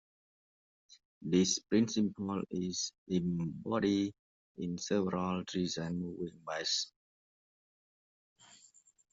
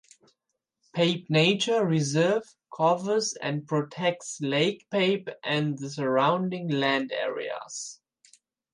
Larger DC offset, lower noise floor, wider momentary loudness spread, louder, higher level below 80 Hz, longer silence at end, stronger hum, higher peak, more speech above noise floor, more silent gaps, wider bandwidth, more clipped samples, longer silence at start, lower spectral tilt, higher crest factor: neither; second, -66 dBFS vs -82 dBFS; about the same, 10 LU vs 11 LU; second, -35 LUFS vs -26 LUFS; about the same, -70 dBFS vs -74 dBFS; first, 2.25 s vs 0.8 s; neither; second, -16 dBFS vs -10 dBFS; second, 31 dB vs 56 dB; first, 2.98-3.06 s, 4.19-4.55 s vs none; second, 8 kHz vs 11.5 kHz; neither; first, 1.2 s vs 0.95 s; about the same, -4.5 dB/octave vs -4.5 dB/octave; about the same, 20 dB vs 18 dB